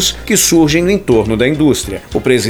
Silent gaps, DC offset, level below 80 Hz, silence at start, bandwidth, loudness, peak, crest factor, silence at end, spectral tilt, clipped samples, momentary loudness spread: none; under 0.1%; -32 dBFS; 0 s; 18.5 kHz; -12 LUFS; 0 dBFS; 12 dB; 0 s; -4 dB/octave; under 0.1%; 8 LU